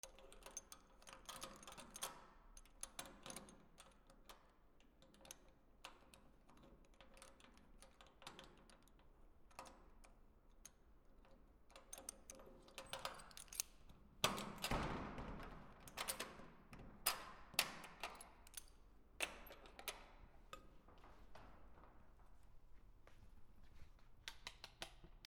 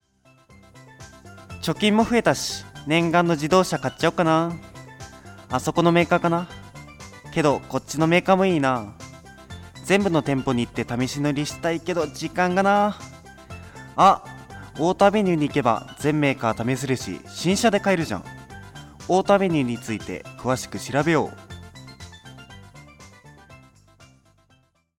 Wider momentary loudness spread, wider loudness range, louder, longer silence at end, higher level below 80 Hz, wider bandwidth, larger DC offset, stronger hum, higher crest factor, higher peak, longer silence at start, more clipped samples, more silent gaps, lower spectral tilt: about the same, 24 LU vs 23 LU; first, 18 LU vs 3 LU; second, -50 LUFS vs -22 LUFS; second, 0 s vs 1.45 s; second, -66 dBFS vs -52 dBFS; first, 19.5 kHz vs 17.5 kHz; neither; neither; first, 38 dB vs 20 dB; second, -16 dBFS vs -4 dBFS; second, 0.05 s vs 0.75 s; neither; neither; second, -2 dB/octave vs -5.5 dB/octave